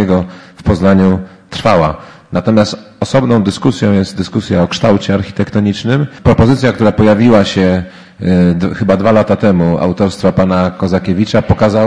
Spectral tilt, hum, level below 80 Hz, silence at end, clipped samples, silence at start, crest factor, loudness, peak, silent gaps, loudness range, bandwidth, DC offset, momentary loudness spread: -7 dB/octave; none; -32 dBFS; 0 s; 0.3%; 0 s; 10 dB; -12 LUFS; 0 dBFS; none; 2 LU; 10.5 kHz; 0.5%; 8 LU